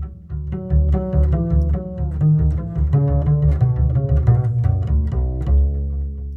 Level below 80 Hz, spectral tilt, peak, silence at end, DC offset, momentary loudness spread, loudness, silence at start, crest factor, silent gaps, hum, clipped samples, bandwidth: -20 dBFS; -12 dB/octave; -2 dBFS; 0 s; under 0.1%; 9 LU; -19 LUFS; 0 s; 14 dB; none; none; under 0.1%; 2.9 kHz